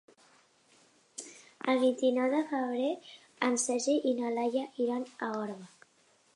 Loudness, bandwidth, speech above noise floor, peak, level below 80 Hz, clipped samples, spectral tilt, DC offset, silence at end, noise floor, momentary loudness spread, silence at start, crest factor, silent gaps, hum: -31 LUFS; 11.5 kHz; 37 dB; -14 dBFS; -88 dBFS; under 0.1%; -3 dB/octave; under 0.1%; 0.7 s; -67 dBFS; 17 LU; 1.2 s; 18 dB; none; none